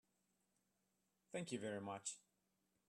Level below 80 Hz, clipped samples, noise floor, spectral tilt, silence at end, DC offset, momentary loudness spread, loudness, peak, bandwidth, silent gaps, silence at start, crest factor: under -90 dBFS; under 0.1%; -86 dBFS; -4 dB/octave; 0.7 s; under 0.1%; 6 LU; -49 LUFS; -32 dBFS; 13 kHz; none; 1.3 s; 22 dB